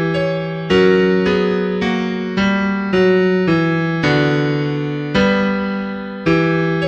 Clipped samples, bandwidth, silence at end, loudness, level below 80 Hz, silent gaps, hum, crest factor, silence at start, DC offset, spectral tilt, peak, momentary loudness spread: under 0.1%; 7.8 kHz; 0 s; -16 LUFS; -44 dBFS; none; none; 14 dB; 0 s; under 0.1%; -7.5 dB/octave; -2 dBFS; 7 LU